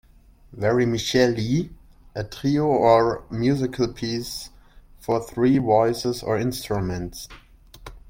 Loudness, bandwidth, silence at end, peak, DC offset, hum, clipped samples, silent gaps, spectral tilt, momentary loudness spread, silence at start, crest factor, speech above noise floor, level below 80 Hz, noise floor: -22 LUFS; 16.5 kHz; 0 s; -4 dBFS; under 0.1%; none; under 0.1%; none; -6 dB/octave; 16 LU; 0.5 s; 20 dB; 30 dB; -46 dBFS; -51 dBFS